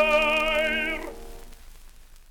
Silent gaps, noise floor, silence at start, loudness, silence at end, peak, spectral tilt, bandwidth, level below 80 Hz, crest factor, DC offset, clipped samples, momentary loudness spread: none; -47 dBFS; 0 s; -23 LUFS; 0.1 s; -10 dBFS; -3 dB/octave; 18.5 kHz; -42 dBFS; 16 dB; under 0.1%; under 0.1%; 23 LU